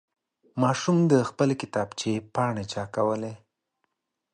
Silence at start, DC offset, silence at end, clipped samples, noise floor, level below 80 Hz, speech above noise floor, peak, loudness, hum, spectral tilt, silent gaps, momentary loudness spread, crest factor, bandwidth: 0.55 s; under 0.1%; 0.95 s; under 0.1%; -78 dBFS; -62 dBFS; 53 dB; -8 dBFS; -26 LUFS; none; -6 dB/octave; none; 10 LU; 20 dB; 10 kHz